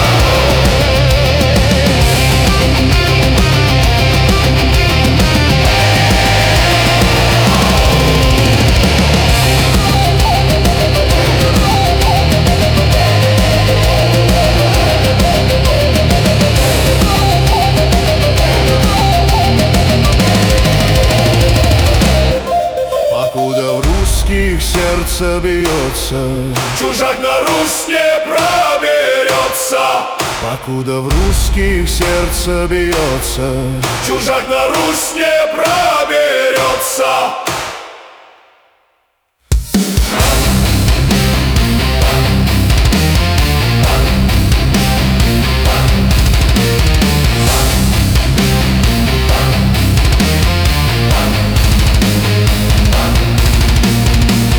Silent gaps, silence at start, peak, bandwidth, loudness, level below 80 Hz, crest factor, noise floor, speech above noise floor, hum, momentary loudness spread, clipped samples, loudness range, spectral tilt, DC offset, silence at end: none; 0 s; -2 dBFS; over 20 kHz; -11 LUFS; -16 dBFS; 8 dB; -61 dBFS; 47 dB; none; 5 LU; under 0.1%; 5 LU; -4.5 dB/octave; under 0.1%; 0 s